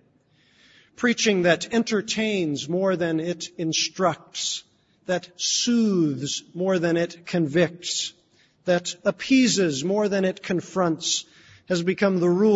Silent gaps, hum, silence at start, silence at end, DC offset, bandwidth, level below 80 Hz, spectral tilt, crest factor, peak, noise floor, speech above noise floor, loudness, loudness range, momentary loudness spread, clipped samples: none; none; 1 s; 0 s; under 0.1%; 8 kHz; -66 dBFS; -4 dB/octave; 18 dB; -6 dBFS; -62 dBFS; 39 dB; -23 LUFS; 2 LU; 8 LU; under 0.1%